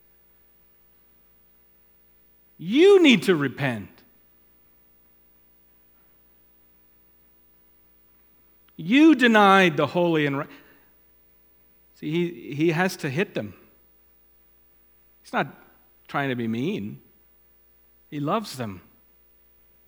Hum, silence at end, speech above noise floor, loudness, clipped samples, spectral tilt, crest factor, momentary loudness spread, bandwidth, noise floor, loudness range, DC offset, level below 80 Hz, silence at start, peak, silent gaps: 60 Hz at -55 dBFS; 1.1 s; 37 dB; -21 LUFS; under 0.1%; -5.5 dB/octave; 22 dB; 22 LU; 18.5 kHz; -58 dBFS; 12 LU; under 0.1%; -68 dBFS; 2.6 s; -2 dBFS; none